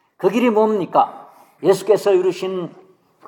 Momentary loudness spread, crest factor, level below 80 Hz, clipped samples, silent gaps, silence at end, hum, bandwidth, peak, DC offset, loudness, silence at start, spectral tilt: 10 LU; 16 dB; -76 dBFS; under 0.1%; none; 0.6 s; none; 17.5 kHz; -2 dBFS; under 0.1%; -18 LUFS; 0.2 s; -6 dB/octave